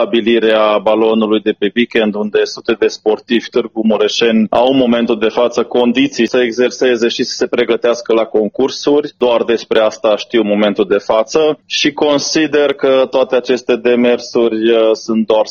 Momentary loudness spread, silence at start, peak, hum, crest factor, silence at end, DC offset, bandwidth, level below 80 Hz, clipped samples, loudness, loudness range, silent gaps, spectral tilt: 4 LU; 0 s; 0 dBFS; none; 12 dB; 0 s; under 0.1%; 7.2 kHz; -54 dBFS; under 0.1%; -13 LUFS; 1 LU; none; -4 dB/octave